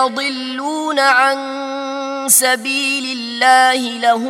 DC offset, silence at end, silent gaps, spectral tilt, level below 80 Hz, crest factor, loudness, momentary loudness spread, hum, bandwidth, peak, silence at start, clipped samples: under 0.1%; 0 s; none; 0 dB/octave; -72 dBFS; 16 dB; -15 LUFS; 12 LU; none; 16.5 kHz; 0 dBFS; 0 s; under 0.1%